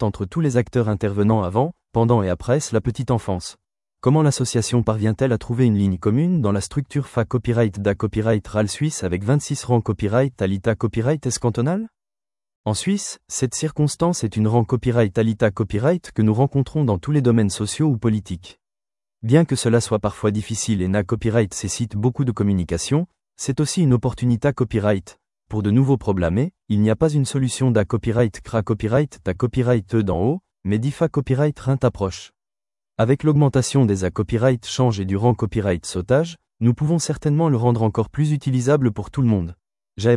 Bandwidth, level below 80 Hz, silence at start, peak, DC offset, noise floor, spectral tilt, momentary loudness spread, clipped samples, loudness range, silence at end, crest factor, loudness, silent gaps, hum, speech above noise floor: 12 kHz; -46 dBFS; 0 s; -4 dBFS; under 0.1%; under -90 dBFS; -6.5 dB/octave; 6 LU; under 0.1%; 2 LU; 0 s; 16 dB; -20 LUFS; 12.56-12.64 s; none; over 71 dB